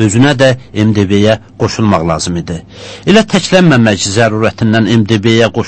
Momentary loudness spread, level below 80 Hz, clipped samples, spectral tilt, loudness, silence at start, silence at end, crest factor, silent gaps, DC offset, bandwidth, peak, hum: 9 LU; -38 dBFS; 0.8%; -5.5 dB/octave; -10 LUFS; 0 s; 0 s; 10 dB; none; under 0.1%; 9 kHz; 0 dBFS; none